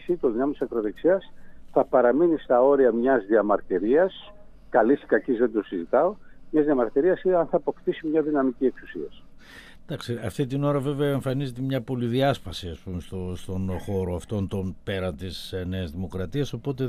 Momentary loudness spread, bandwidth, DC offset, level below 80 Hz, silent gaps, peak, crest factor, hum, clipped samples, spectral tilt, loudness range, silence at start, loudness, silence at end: 13 LU; 14.5 kHz; under 0.1%; -50 dBFS; none; -6 dBFS; 18 dB; none; under 0.1%; -7.5 dB/octave; 8 LU; 0 s; -25 LUFS; 0 s